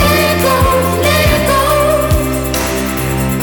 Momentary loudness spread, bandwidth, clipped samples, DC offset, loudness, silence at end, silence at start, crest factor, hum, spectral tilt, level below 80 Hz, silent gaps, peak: 5 LU; over 20 kHz; under 0.1%; under 0.1%; -12 LUFS; 0 s; 0 s; 12 dB; none; -4.5 dB/octave; -22 dBFS; none; 0 dBFS